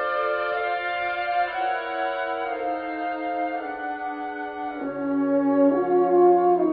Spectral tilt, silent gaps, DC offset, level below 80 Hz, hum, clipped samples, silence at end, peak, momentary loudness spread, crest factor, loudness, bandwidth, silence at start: -8.5 dB/octave; none; under 0.1%; -64 dBFS; none; under 0.1%; 0 s; -8 dBFS; 12 LU; 16 dB; -24 LUFS; 5 kHz; 0 s